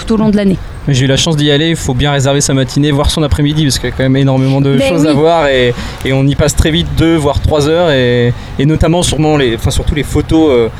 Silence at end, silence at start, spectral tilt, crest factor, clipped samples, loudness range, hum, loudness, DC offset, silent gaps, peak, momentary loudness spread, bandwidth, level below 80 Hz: 0 s; 0 s; -5.5 dB/octave; 10 dB; under 0.1%; 1 LU; none; -11 LUFS; under 0.1%; none; 0 dBFS; 5 LU; 15 kHz; -22 dBFS